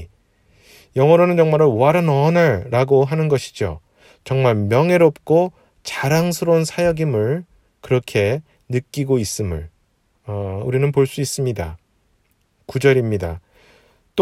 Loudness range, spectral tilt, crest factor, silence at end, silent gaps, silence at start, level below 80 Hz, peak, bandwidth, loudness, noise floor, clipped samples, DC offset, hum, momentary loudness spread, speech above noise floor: 7 LU; -6.5 dB/octave; 18 dB; 0 s; none; 0 s; -46 dBFS; 0 dBFS; 15.5 kHz; -18 LUFS; -63 dBFS; under 0.1%; under 0.1%; none; 13 LU; 46 dB